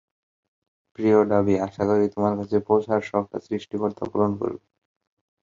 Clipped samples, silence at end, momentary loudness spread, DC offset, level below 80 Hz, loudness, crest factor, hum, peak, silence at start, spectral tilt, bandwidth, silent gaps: under 0.1%; 0.85 s; 11 LU; under 0.1%; -56 dBFS; -23 LUFS; 20 dB; none; -4 dBFS; 1 s; -8.5 dB/octave; 7.4 kHz; none